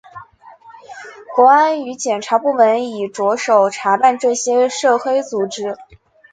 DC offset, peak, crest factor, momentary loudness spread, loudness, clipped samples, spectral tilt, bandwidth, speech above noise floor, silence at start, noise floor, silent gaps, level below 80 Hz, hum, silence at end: under 0.1%; 0 dBFS; 16 dB; 13 LU; -15 LUFS; under 0.1%; -3 dB/octave; 9.4 kHz; 28 dB; 0.15 s; -43 dBFS; none; -64 dBFS; none; 0.5 s